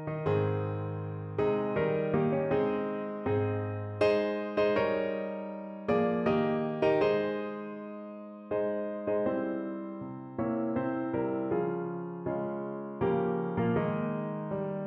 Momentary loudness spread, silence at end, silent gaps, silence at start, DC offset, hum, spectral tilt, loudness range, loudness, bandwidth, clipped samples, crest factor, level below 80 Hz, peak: 10 LU; 0 s; none; 0 s; under 0.1%; none; -9 dB/octave; 4 LU; -31 LUFS; 6 kHz; under 0.1%; 16 dB; -62 dBFS; -16 dBFS